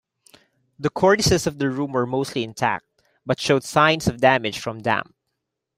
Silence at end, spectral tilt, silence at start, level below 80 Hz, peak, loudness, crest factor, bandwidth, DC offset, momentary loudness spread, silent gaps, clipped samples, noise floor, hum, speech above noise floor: 0.75 s; -4.5 dB/octave; 0.8 s; -50 dBFS; -2 dBFS; -21 LUFS; 20 dB; 16 kHz; under 0.1%; 10 LU; none; under 0.1%; -79 dBFS; none; 58 dB